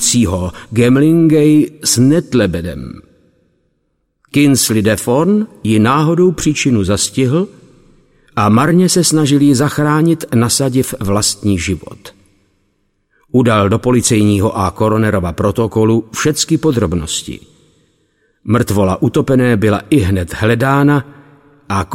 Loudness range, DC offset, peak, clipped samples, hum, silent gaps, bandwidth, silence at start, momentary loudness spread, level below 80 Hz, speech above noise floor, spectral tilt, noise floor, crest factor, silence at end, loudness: 4 LU; under 0.1%; 0 dBFS; under 0.1%; none; none; 16.5 kHz; 0 s; 8 LU; -38 dBFS; 53 dB; -5 dB/octave; -65 dBFS; 14 dB; 0 s; -13 LUFS